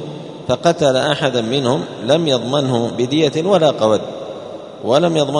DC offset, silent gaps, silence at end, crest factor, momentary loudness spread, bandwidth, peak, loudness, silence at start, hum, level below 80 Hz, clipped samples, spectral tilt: under 0.1%; none; 0 s; 16 dB; 14 LU; 11 kHz; 0 dBFS; -16 LUFS; 0 s; none; -54 dBFS; under 0.1%; -5.5 dB/octave